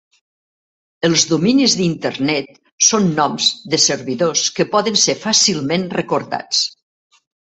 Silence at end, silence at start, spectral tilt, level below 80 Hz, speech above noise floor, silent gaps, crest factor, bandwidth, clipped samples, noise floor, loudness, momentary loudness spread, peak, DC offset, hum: 0.9 s; 1 s; -3 dB/octave; -58 dBFS; over 74 dB; 2.72-2.78 s; 18 dB; 8.4 kHz; under 0.1%; under -90 dBFS; -15 LUFS; 7 LU; 0 dBFS; under 0.1%; none